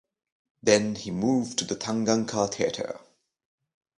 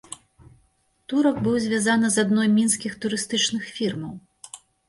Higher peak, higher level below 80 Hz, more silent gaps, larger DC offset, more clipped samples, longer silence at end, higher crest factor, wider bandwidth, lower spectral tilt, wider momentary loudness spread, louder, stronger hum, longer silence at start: first, -4 dBFS vs -8 dBFS; about the same, -64 dBFS vs -60 dBFS; neither; neither; neither; first, 1 s vs 0.3 s; first, 24 dB vs 16 dB; about the same, 11 kHz vs 11.5 kHz; about the same, -4 dB/octave vs -3.5 dB/octave; second, 10 LU vs 21 LU; second, -26 LUFS vs -22 LUFS; neither; first, 0.65 s vs 0.1 s